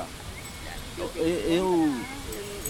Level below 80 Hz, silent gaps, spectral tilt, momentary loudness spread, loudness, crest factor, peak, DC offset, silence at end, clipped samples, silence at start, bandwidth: -44 dBFS; none; -4.5 dB/octave; 14 LU; -29 LUFS; 16 dB; -12 dBFS; 0.1%; 0 s; under 0.1%; 0 s; 17.5 kHz